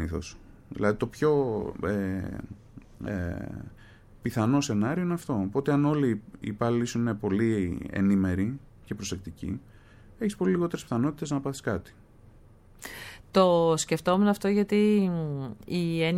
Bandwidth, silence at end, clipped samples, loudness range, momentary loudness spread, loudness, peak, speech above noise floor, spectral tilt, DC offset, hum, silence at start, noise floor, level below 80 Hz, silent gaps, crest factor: 15.5 kHz; 0 s; under 0.1%; 6 LU; 16 LU; -28 LUFS; -10 dBFS; 27 dB; -6.5 dB/octave; under 0.1%; none; 0 s; -54 dBFS; -52 dBFS; none; 18 dB